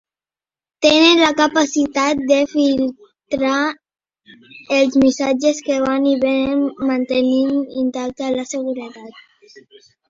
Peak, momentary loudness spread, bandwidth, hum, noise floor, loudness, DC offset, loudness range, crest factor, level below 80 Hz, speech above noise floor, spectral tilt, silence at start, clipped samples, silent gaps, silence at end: 0 dBFS; 11 LU; 7.8 kHz; none; under -90 dBFS; -17 LUFS; under 0.1%; 4 LU; 18 dB; -54 dBFS; over 73 dB; -3 dB/octave; 0.8 s; under 0.1%; none; 0.9 s